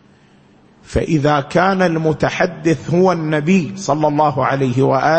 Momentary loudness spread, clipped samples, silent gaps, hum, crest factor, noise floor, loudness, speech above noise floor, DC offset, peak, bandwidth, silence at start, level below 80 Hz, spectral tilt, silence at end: 3 LU; under 0.1%; none; none; 16 dB; -49 dBFS; -16 LUFS; 34 dB; under 0.1%; 0 dBFS; 8.6 kHz; 0.9 s; -40 dBFS; -6.5 dB/octave; 0 s